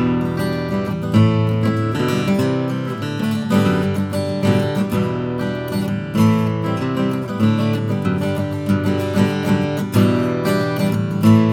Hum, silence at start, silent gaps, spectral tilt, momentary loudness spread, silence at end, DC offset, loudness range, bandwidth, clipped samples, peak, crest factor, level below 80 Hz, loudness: none; 0 s; none; -7.5 dB/octave; 6 LU; 0 s; under 0.1%; 1 LU; 17 kHz; under 0.1%; -2 dBFS; 16 dB; -48 dBFS; -19 LUFS